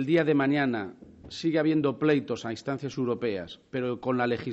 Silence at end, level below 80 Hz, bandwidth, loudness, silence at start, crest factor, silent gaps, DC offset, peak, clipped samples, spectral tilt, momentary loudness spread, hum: 0 s; -64 dBFS; 8 kHz; -28 LUFS; 0 s; 16 dB; none; under 0.1%; -12 dBFS; under 0.1%; -5.5 dB/octave; 10 LU; none